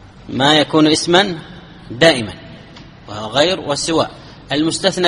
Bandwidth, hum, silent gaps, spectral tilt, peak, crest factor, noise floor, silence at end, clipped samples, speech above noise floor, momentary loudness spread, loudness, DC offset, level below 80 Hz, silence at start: 11.5 kHz; none; none; -4 dB/octave; 0 dBFS; 16 dB; -38 dBFS; 0 s; under 0.1%; 23 dB; 17 LU; -15 LUFS; under 0.1%; -46 dBFS; 0.25 s